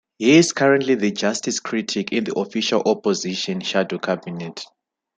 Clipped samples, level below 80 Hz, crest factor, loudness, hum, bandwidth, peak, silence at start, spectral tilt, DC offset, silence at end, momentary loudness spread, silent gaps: under 0.1%; -66 dBFS; 18 dB; -20 LUFS; none; 9.4 kHz; -2 dBFS; 0.2 s; -4 dB/octave; under 0.1%; 0.5 s; 13 LU; none